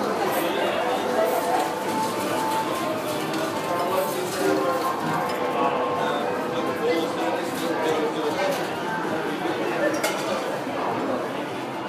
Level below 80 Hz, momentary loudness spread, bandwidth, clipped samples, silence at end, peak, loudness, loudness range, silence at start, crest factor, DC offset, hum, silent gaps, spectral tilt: -68 dBFS; 4 LU; 15.5 kHz; under 0.1%; 0 s; -10 dBFS; -25 LUFS; 1 LU; 0 s; 16 dB; under 0.1%; none; none; -4 dB/octave